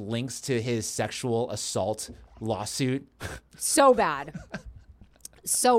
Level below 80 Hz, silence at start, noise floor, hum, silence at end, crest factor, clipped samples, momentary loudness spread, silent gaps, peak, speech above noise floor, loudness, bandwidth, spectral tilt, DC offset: -54 dBFS; 0 s; -52 dBFS; none; 0 s; 20 dB; under 0.1%; 19 LU; none; -8 dBFS; 25 dB; -27 LUFS; 16.5 kHz; -4 dB/octave; under 0.1%